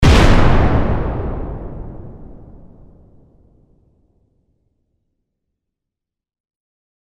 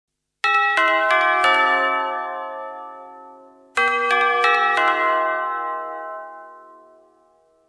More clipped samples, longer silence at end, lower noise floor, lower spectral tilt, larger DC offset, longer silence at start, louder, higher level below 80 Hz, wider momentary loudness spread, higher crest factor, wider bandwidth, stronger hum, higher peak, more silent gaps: neither; first, 4.7 s vs 1.1 s; first, -83 dBFS vs -58 dBFS; first, -6.5 dB/octave vs -1 dB/octave; neither; second, 0 s vs 0.45 s; about the same, -16 LUFS vs -18 LUFS; first, -22 dBFS vs -74 dBFS; first, 26 LU vs 18 LU; about the same, 18 dB vs 18 dB; about the same, 11.5 kHz vs 11 kHz; neither; first, 0 dBFS vs -4 dBFS; neither